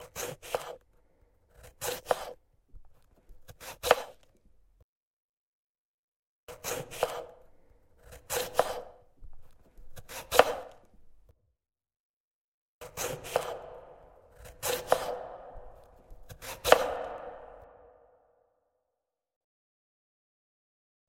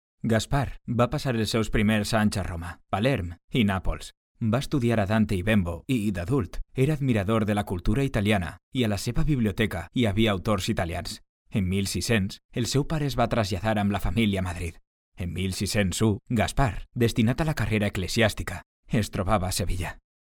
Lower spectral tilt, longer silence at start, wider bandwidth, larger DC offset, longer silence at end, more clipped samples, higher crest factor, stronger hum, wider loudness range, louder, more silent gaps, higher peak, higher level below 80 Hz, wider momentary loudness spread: second, -2 dB/octave vs -5.5 dB/octave; second, 0 s vs 0.25 s; about the same, 16.5 kHz vs 17.5 kHz; neither; first, 3.25 s vs 0.45 s; neither; first, 34 dB vs 18 dB; neither; first, 9 LU vs 2 LU; second, -32 LUFS vs -26 LUFS; first, 4.83-6.47 s, 11.96-12.81 s vs 3.44-3.48 s, 4.17-4.35 s, 8.63-8.72 s, 11.29-11.45 s, 12.45-12.49 s, 14.87-15.12 s, 18.66-18.83 s; first, -2 dBFS vs -8 dBFS; second, -58 dBFS vs -38 dBFS; first, 27 LU vs 9 LU